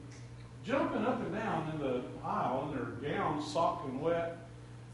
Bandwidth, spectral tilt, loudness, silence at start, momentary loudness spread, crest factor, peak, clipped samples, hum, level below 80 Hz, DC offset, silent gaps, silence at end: 11.5 kHz; -6.5 dB/octave; -35 LUFS; 0 s; 16 LU; 16 dB; -18 dBFS; under 0.1%; none; -60 dBFS; under 0.1%; none; 0 s